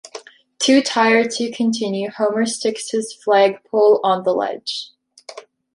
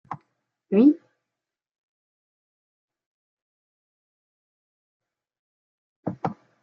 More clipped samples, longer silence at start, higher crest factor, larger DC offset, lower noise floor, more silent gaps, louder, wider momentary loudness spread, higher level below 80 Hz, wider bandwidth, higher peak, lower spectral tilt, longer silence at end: neither; about the same, 0.05 s vs 0.1 s; second, 16 dB vs 24 dB; neither; second, -40 dBFS vs -88 dBFS; second, none vs 1.71-2.88 s, 3.06-5.00 s, 5.39-6.03 s; first, -18 LUFS vs -23 LUFS; about the same, 22 LU vs 21 LU; first, -70 dBFS vs -76 dBFS; first, 11.5 kHz vs 4.6 kHz; first, -2 dBFS vs -6 dBFS; second, -3.5 dB/octave vs -10 dB/octave; about the same, 0.35 s vs 0.3 s